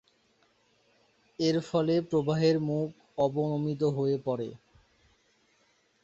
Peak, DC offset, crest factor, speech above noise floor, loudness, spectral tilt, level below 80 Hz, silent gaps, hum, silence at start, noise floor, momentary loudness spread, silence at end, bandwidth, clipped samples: -14 dBFS; under 0.1%; 18 dB; 41 dB; -29 LUFS; -7.5 dB/octave; -68 dBFS; none; none; 1.4 s; -69 dBFS; 9 LU; 1.5 s; 8 kHz; under 0.1%